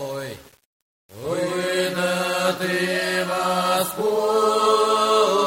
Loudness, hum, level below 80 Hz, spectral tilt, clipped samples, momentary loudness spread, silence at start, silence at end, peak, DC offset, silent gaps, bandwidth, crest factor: -21 LUFS; none; -62 dBFS; -3.5 dB/octave; under 0.1%; 12 LU; 0 s; 0 s; -6 dBFS; under 0.1%; 0.65-1.09 s; 16.5 kHz; 16 dB